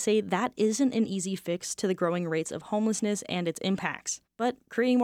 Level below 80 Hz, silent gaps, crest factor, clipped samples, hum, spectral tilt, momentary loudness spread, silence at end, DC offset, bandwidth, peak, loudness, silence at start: -72 dBFS; none; 16 dB; under 0.1%; none; -4.5 dB/octave; 6 LU; 0 s; under 0.1%; 16 kHz; -12 dBFS; -29 LUFS; 0 s